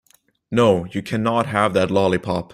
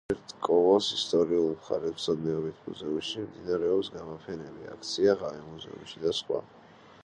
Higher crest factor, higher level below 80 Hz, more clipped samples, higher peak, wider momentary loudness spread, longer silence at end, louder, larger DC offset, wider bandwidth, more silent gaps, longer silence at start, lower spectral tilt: about the same, 18 dB vs 18 dB; first, -52 dBFS vs -62 dBFS; neither; first, -2 dBFS vs -10 dBFS; second, 6 LU vs 16 LU; second, 0.1 s vs 0.45 s; first, -19 LUFS vs -29 LUFS; neither; first, 14.5 kHz vs 10.5 kHz; neither; first, 0.5 s vs 0.1 s; first, -6.5 dB/octave vs -5 dB/octave